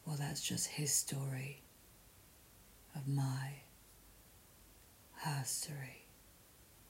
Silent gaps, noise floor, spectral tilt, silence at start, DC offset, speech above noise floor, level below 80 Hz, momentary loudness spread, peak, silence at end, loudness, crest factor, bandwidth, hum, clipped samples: none; -63 dBFS; -3.5 dB/octave; 0 s; under 0.1%; 23 dB; -70 dBFS; 26 LU; -22 dBFS; 0 s; -39 LUFS; 22 dB; 16 kHz; none; under 0.1%